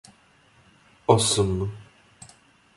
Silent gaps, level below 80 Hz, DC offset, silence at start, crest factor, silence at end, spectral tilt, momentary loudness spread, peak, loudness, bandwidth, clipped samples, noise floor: none; -46 dBFS; under 0.1%; 1.1 s; 24 dB; 0.95 s; -4.5 dB/octave; 14 LU; -4 dBFS; -23 LUFS; 11.5 kHz; under 0.1%; -58 dBFS